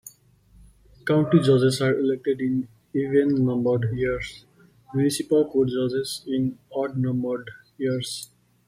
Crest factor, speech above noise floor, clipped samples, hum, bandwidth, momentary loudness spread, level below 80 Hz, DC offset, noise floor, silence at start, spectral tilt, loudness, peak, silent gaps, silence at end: 18 dB; 33 dB; under 0.1%; none; 15 kHz; 12 LU; -54 dBFS; under 0.1%; -56 dBFS; 0.05 s; -6.5 dB/octave; -24 LUFS; -6 dBFS; none; 0.4 s